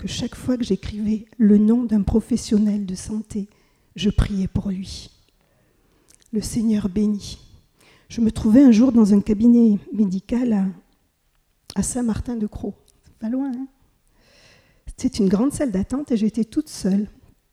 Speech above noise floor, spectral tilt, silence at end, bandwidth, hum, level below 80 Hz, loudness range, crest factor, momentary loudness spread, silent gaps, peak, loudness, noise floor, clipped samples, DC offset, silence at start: 46 dB; -6.5 dB/octave; 0.4 s; 13 kHz; none; -38 dBFS; 11 LU; 18 dB; 16 LU; none; -2 dBFS; -20 LUFS; -65 dBFS; under 0.1%; under 0.1%; 0 s